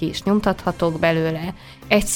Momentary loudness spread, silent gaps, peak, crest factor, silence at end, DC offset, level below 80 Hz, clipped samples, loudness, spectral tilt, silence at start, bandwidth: 10 LU; none; -2 dBFS; 18 dB; 0 s; under 0.1%; -40 dBFS; under 0.1%; -21 LUFS; -5 dB/octave; 0 s; 18 kHz